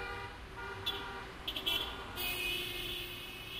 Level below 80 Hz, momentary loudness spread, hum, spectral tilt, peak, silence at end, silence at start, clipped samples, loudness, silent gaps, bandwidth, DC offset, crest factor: -54 dBFS; 10 LU; none; -2.5 dB/octave; -20 dBFS; 0 s; 0 s; under 0.1%; -38 LUFS; none; 15.5 kHz; under 0.1%; 20 dB